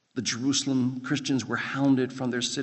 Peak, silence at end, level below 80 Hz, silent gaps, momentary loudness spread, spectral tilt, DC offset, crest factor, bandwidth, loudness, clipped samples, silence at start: -12 dBFS; 0 s; -70 dBFS; none; 5 LU; -4 dB/octave; under 0.1%; 14 dB; 8.4 kHz; -27 LUFS; under 0.1%; 0.15 s